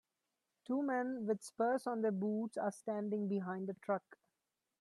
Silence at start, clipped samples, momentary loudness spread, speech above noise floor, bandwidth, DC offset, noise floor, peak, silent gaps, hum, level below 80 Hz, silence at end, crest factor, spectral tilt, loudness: 0.7 s; under 0.1%; 5 LU; 51 dB; 12.5 kHz; under 0.1%; -89 dBFS; -24 dBFS; none; none; -88 dBFS; 0.65 s; 16 dB; -7 dB/octave; -39 LUFS